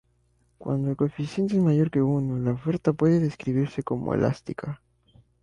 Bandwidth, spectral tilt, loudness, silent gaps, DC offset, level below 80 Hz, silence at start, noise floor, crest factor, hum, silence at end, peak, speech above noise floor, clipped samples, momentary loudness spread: 10 kHz; -9 dB/octave; -25 LUFS; none; under 0.1%; -56 dBFS; 0.6 s; -66 dBFS; 16 dB; none; 0.7 s; -10 dBFS; 42 dB; under 0.1%; 12 LU